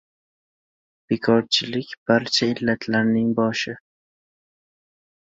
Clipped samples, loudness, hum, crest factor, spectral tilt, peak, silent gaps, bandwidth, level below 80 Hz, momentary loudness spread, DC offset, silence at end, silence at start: under 0.1%; -21 LUFS; none; 20 dB; -4.5 dB/octave; -4 dBFS; 1.98-2.06 s; 7.8 kHz; -62 dBFS; 10 LU; under 0.1%; 1.6 s; 1.1 s